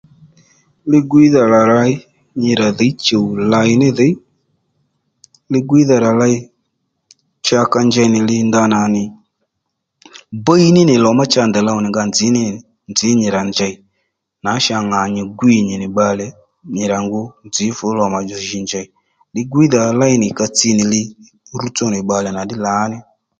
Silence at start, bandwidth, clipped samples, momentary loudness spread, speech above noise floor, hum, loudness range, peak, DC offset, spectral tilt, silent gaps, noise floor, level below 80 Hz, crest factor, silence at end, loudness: 0.85 s; 9.2 kHz; under 0.1%; 13 LU; 60 dB; none; 4 LU; 0 dBFS; under 0.1%; -5 dB/octave; none; -74 dBFS; -52 dBFS; 14 dB; 0.4 s; -14 LUFS